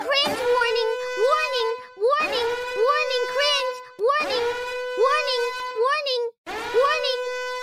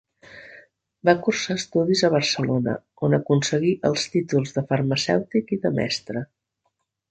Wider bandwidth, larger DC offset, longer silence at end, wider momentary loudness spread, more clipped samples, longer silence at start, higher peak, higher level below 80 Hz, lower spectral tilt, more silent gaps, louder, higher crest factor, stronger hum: first, 15.5 kHz vs 9.2 kHz; neither; second, 0 s vs 0.85 s; about the same, 7 LU vs 8 LU; neither; second, 0 s vs 0.3 s; second, -10 dBFS vs -4 dBFS; about the same, -60 dBFS vs -60 dBFS; second, -1 dB/octave vs -5 dB/octave; first, 6.38-6.44 s vs none; about the same, -23 LUFS vs -23 LUFS; second, 14 dB vs 20 dB; neither